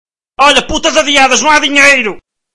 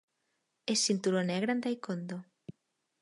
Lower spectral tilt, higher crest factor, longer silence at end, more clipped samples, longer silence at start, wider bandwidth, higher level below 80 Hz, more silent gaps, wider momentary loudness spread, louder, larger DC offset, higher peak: second, -1 dB/octave vs -4 dB/octave; second, 10 dB vs 18 dB; second, 0 s vs 0.5 s; first, 1% vs under 0.1%; second, 0.05 s vs 0.65 s; about the same, 12 kHz vs 11.5 kHz; first, -34 dBFS vs -82 dBFS; neither; second, 6 LU vs 22 LU; first, -7 LUFS vs -32 LUFS; first, 3% vs under 0.1%; first, 0 dBFS vs -16 dBFS